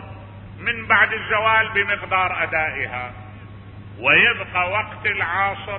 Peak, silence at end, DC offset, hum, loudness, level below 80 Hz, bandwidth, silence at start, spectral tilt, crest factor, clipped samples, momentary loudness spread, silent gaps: -2 dBFS; 0 s; under 0.1%; none; -19 LUFS; -46 dBFS; 4.9 kHz; 0 s; -8.5 dB/octave; 20 dB; under 0.1%; 23 LU; none